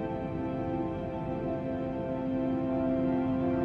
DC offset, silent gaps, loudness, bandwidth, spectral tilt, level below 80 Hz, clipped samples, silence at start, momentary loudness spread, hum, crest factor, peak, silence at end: under 0.1%; none; -32 LUFS; 5 kHz; -10 dB/octave; -50 dBFS; under 0.1%; 0 s; 5 LU; none; 12 dB; -20 dBFS; 0 s